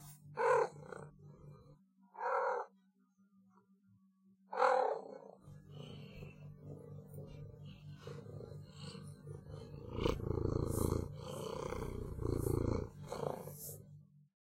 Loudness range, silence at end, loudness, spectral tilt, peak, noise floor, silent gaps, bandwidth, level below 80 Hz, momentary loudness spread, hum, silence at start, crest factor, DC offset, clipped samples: 12 LU; 0.3 s; -39 LUFS; -6 dB/octave; -18 dBFS; -72 dBFS; none; 16 kHz; -54 dBFS; 20 LU; none; 0 s; 22 dB; under 0.1%; under 0.1%